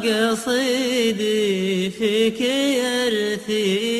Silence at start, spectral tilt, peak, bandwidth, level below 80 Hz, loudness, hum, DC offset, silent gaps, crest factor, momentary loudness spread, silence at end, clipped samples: 0 s; -4 dB/octave; -6 dBFS; 15 kHz; -62 dBFS; -20 LUFS; none; under 0.1%; none; 14 dB; 2 LU; 0 s; under 0.1%